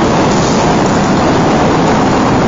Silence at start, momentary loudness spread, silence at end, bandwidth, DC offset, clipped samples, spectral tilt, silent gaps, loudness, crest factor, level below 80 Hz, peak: 0 s; 1 LU; 0 s; 7.6 kHz; under 0.1%; under 0.1%; -5.5 dB/octave; none; -10 LUFS; 8 dB; -28 dBFS; -2 dBFS